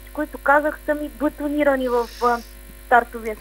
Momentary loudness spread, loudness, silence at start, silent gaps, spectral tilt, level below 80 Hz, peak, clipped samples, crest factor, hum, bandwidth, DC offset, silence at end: 9 LU; -21 LUFS; 0 s; none; -5 dB/octave; -42 dBFS; 0 dBFS; under 0.1%; 22 dB; none; 16 kHz; under 0.1%; 0 s